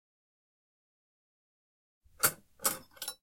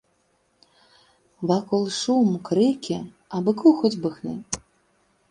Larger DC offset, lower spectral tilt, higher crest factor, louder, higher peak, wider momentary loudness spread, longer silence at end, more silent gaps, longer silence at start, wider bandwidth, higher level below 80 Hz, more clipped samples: neither; second, -0.5 dB/octave vs -6 dB/octave; first, 28 dB vs 20 dB; second, -33 LUFS vs -23 LUFS; second, -12 dBFS vs -4 dBFS; second, 9 LU vs 14 LU; second, 0.1 s vs 0.7 s; neither; first, 2.2 s vs 1.4 s; first, 16.5 kHz vs 11 kHz; second, -72 dBFS vs -62 dBFS; neither